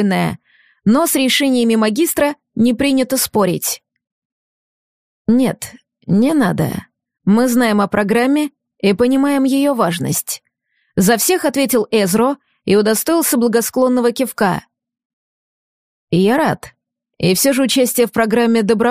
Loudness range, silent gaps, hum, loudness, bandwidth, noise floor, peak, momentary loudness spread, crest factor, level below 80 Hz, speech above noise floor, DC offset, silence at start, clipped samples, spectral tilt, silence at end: 4 LU; 4.12-5.25 s, 15.05-16.08 s; none; -15 LUFS; 15.5 kHz; -66 dBFS; -2 dBFS; 9 LU; 14 dB; -52 dBFS; 51 dB; under 0.1%; 0 s; under 0.1%; -4.5 dB/octave; 0 s